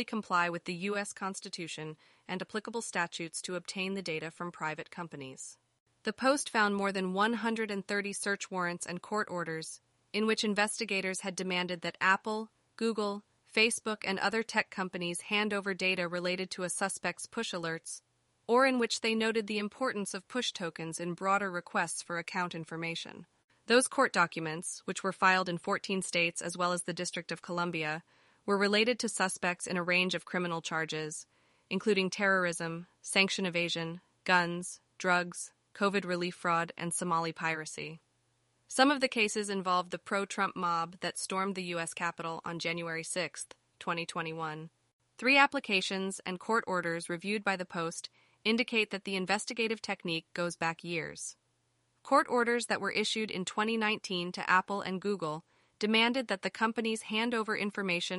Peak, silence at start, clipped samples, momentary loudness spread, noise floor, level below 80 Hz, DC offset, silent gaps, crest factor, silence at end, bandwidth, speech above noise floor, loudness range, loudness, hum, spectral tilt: -10 dBFS; 0 s; under 0.1%; 12 LU; -76 dBFS; -78 dBFS; under 0.1%; 5.80-5.86 s, 23.44-23.48 s, 44.93-44.99 s; 24 dB; 0 s; 11.5 kHz; 43 dB; 5 LU; -32 LUFS; none; -3.5 dB/octave